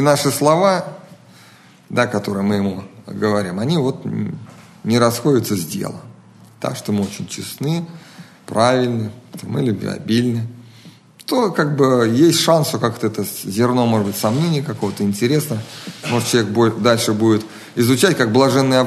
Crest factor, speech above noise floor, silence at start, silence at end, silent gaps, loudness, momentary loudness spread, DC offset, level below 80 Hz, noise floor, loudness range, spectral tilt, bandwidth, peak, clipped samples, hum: 18 dB; 29 dB; 0 s; 0 s; none; -18 LUFS; 13 LU; under 0.1%; -60 dBFS; -46 dBFS; 5 LU; -5.5 dB/octave; 13.5 kHz; 0 dBFS; under 0.1%; none